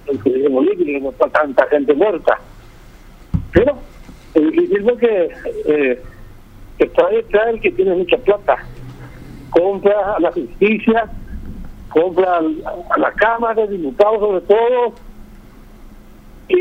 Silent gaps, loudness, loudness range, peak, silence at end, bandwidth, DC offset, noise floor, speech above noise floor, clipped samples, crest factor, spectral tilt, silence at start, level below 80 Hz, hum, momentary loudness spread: none; -16 LUFS; 2 LU; 0 dBFS; 0 s; 8 kHz; under 0.1%; -40 dBFS; 25 dB; under 0.1%; 16 dB; -7.5 dB/octave; 0.05 s; -38 dBFS; none; 12 LU